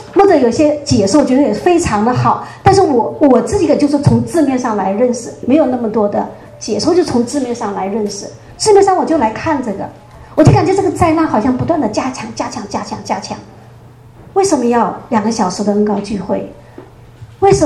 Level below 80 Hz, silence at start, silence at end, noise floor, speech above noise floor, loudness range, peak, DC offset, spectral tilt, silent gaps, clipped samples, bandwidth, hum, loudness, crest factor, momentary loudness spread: -38 dBFS; 0 s; 0 s; -38 dBFS; 26 dB; 5 LU; 0 dBFS; under 0.1%; -6 dB/octave; none; 0.2%; 12.5 kHz; none; -13 LUFS; 14 dB; 12 LU